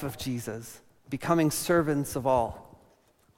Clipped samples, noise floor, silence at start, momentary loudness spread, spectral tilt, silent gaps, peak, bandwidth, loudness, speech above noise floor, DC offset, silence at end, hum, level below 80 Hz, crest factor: under 0.1%; -64 dBFS; 0 s; 15 LU; -5.5 dB/octave; none; -10 dBFS; 16.5 kHz; -28 LUFS; 36 dB; under 0.1%; 0.75 s; none; -54 dBFS; 18 dB